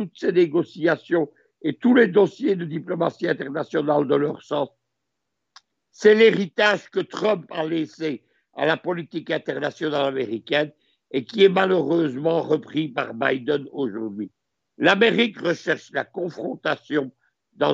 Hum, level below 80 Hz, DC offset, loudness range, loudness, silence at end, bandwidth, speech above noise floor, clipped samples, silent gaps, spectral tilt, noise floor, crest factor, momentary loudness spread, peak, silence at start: none; -74 dBFS; under 0.1%; 4 LU; -22 LUFS; 0 s; 7.8 kHz; 59 dB; under 0.1%; none; -6 dB/octave; -80 dBFS; 20 dB; 13 LU; -2 dBFS; 0 s